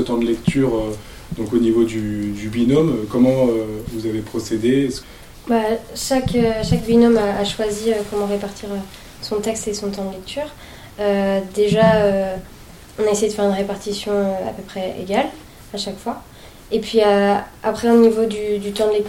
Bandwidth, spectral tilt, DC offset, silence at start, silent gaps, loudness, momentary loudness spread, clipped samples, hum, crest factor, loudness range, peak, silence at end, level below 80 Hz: 17 kHz; -5.5 dB/octave; under 0.1%; 0 s; none; -19 LUFS; 14 LU; under 0.1%; none; 16 dB; 5 LU; -2 dBFS; 0 s; -40 dBFS